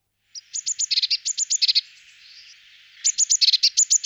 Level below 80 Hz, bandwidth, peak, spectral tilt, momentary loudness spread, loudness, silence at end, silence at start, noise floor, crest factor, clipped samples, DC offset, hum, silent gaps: -78 dBFS; over 20 kHz; -6 dBFS; 8.5 dB/octave; 12 LU; -19 LUFS; 0.05 s; 0.35 s; -50 dBFS; 18 dB; under 0.1%; under 0.1%; none; none